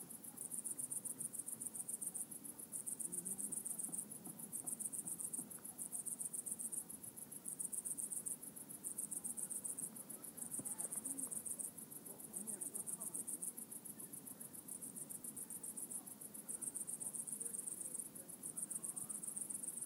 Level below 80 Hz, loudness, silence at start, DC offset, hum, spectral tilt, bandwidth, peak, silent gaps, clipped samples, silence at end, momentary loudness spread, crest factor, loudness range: under -90 dBFS; -45 LUFS; 0 s; under 0.1%; none; -2.5 dB/octave; 16 kHz; -26 dBFS; none; under 0.1%; 0 s; 7 LU; 22 dB; 3 LU